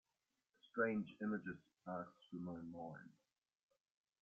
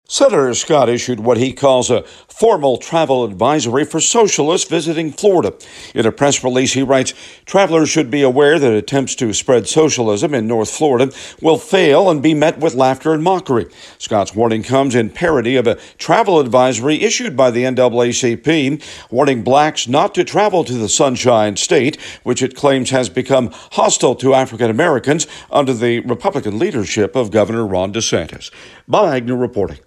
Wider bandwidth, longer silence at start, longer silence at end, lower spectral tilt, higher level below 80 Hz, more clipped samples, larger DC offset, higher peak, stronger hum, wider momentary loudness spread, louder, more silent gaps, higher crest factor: second, 6.6 kHz vs 13 kHz; first, 0.65 s vs 0.1 s; first, 1.1 s vs 0.1 s; first, -6 dB/octave vs -4 dB/octave; second, -86 dBFS vs -50 dBFS; neither; neither; second, -26 dBFS vs 0 dBFS; neither; first, 14 LU vs 6 LU; second, -47 LUFS vs -14 LUFS; neither; first, 22 dB vs 14 dB